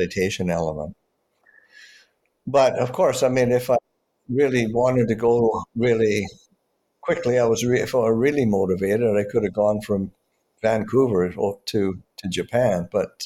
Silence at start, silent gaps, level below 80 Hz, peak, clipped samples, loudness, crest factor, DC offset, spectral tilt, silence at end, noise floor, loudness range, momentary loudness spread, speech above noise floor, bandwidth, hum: 0 s; none; -52 dBFS; -8 dBFS; under 0.1%; -21 LUFS; 14 dB; under 0.1%; -6 dB/octave; 0 s; -69 dBFS; 3 LU; 8 LU; 48 dB; 16 kHz; none